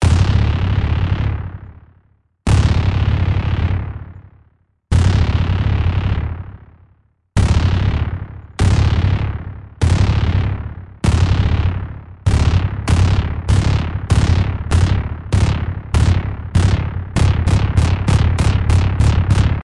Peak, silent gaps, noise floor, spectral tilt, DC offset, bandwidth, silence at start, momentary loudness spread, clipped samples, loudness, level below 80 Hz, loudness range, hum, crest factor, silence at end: -2 dBFS; none; -56 dBFS; -6.5 dB/octave; under 0.1%; 11 kHz; 0 s; 10 LU; under 0.1%; -17 LUFS; -22 dBFS; 3 LU; none; 12 dB; 0 s